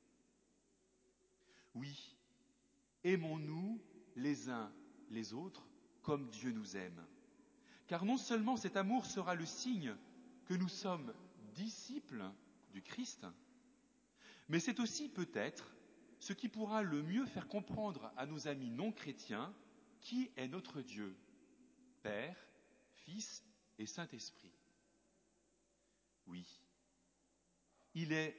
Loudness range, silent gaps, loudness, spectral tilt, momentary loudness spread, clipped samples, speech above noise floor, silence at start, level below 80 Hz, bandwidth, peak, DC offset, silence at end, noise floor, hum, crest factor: 12 LU; none; -44 LUFS; -5 dB/octave; 18 LU; under 0.1%; 36 dB; 1.55 s; -82 dBFS; 8 kHz; -24 dBFS; under 0.1%; 0 s; -79 dBFS; none; 22 dB